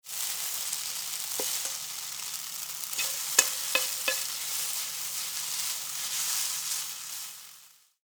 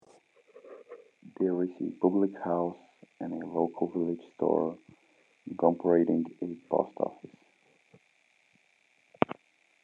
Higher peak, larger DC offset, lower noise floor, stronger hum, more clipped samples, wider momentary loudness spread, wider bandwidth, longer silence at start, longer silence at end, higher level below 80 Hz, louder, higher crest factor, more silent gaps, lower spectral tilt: first, 0 dBFS vs -4 dBFS; neither; second, -56 dBFS vs -68 dBFS; neither; neither; second, 9 LU vs 23 LU; first, over 20 kHz vs 7 kHz; second, 0.05 s vs 0.55 s; second, 0.35 s vs 0.5 s; about the same, -80 dBFS vs -78 dBFS; about the same, -29 LUFS vs -31 LUFS; about the same, 32 dB vs 28 dB; neither; second, 2.5 dB/octave vs -9.5 dB/octave